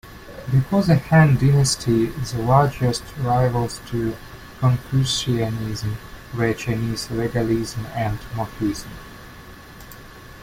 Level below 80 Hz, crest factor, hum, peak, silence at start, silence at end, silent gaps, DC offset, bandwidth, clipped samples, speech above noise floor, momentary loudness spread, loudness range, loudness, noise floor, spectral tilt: -40 dBFS; 18 dB; none; -4 dBFS; 0.05 s; 0 s; none; under 0.1%; 16 kHz; under 0.1%; 21 dB; 24 LU; 7 LU; -21 LUFS; -41 dBFS; -6 dB/octave